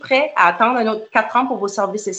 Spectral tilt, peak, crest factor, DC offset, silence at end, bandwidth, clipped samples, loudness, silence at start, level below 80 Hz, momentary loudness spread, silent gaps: -3.5 dB/octave; -2 dBFS; 16 dB; under 0.1%; 0 s; 9 kHz; under 0.1%; -17 LUFS; 0.05 s; -68 dBFS; 7 LU; none